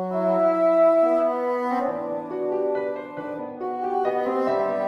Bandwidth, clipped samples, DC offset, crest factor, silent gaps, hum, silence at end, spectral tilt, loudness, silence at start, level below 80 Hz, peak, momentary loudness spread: 6.2 kHz; under 0.1%; under 0.1%; 14 dB; none; none; 0 s; -8 dB/octave; -23 LUFS; 0 s; -68 dBFS; -10 dBFS; 13 LU